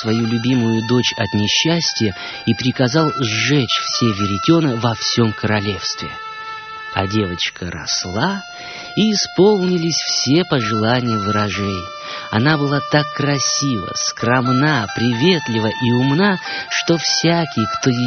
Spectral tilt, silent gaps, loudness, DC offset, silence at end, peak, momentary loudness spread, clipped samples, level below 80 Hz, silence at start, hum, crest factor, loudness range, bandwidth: -4 dB/octave; none; -17 LUFS; under 0.1%; 0 s; -2 dBFS; 8 LU; under 0.1%; -50 dBFS; 0 s; none; 16 dB; 4 LU; 6.8 kHz